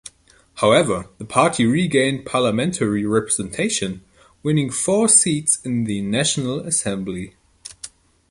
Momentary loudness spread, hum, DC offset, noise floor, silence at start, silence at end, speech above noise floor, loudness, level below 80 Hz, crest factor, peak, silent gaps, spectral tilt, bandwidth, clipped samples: 16 LU; none; under 0.1%; -52 dBFS; 0.05 s; 0.45 s; 33 dB; -19 LUFS; -52 dBFS; 20 dB; -2 dBFS; none; -4 dB/octave; 11.5 kHz; under 0.1%